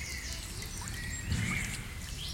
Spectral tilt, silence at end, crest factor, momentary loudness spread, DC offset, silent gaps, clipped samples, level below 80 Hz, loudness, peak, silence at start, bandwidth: -3 dB/octave; 0 s; 16 dB; 7 LU; under 0.1%; none; under 0.1%; -44 dBFS; -37 LUFS; -22 dBFS; 0 s; 17 kHz